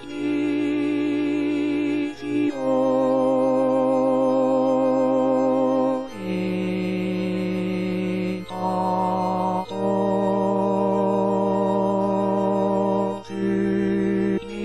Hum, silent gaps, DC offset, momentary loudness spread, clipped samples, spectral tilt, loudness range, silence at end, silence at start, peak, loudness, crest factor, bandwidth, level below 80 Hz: none; none; 0.2%; 5 LU; under 0.1%; -8 dB/octave; 4 LU; 0 s; 0 s; -10 dBFS; -22 LUFS; 12 dB; 12 kHz; -56 dBFS